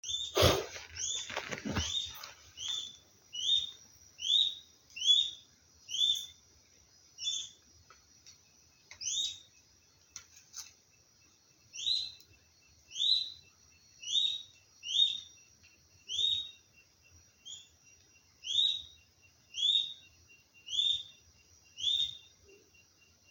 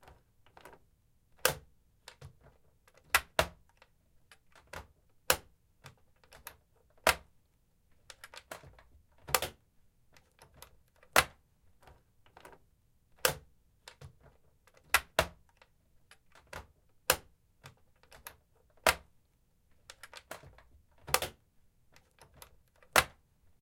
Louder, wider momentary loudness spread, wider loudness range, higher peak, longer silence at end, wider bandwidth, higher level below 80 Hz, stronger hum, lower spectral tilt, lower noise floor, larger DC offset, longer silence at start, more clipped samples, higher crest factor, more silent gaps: about the same, -31 LUFS vs -32 LUFS; second, 22 LU vs 27 LU; first, 9 LU vs 5 LU; second, -12 dBFS vs -4 dBFS; first, 1.1 s vs 0.55 s; about the same, 17 kHz vs 16.5 kHz; about the same, -60 dBFS vs -58 dBFS; neither; about the same, -1.5 dB/octave vs -1 dB/octave; second, -66 dBFS vs -71 dBFS; neither; second, 0.05 s vs 1.45 s; neither; second, 26 dB vs 36 dB; neither